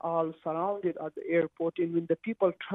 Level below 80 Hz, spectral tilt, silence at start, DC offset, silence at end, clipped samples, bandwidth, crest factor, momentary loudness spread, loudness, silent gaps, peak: -76 dBFS; -9.5 dB/octave; 0.05 s; under 0.1%; 0 s; under 0.1%; 3.9 kHz; 18 dB; 4 LU; -31 LUFS; none; -14 dBFS